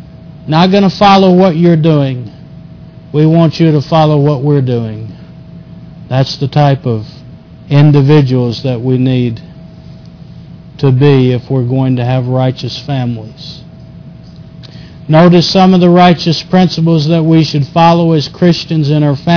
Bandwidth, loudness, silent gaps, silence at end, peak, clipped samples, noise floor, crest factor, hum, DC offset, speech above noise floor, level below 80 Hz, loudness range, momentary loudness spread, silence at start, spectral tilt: 5.4 kHz; -9 LUFS; none; 0 s; 0 dBFS; 0.2%; -32 dBFS; 10 dB; none; under 0.1%; 24 dB; -42 dBFS; 6 LU; 13 LU; 0 s; -7.5 dB/octave